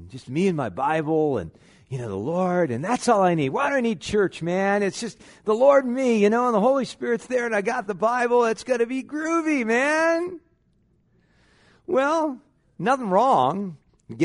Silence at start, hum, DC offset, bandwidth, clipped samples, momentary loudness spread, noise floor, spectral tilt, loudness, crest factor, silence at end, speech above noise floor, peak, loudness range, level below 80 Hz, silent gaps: 0 s; none; under 0.1%; 11 kHz; under 0.1%; 12 LU; -64 dBFS; -6 dB/octave; -22 LUFS; 18 dB; 0 s; 42 dB; -4 dBFS; 4 LU; -60 dBFS; none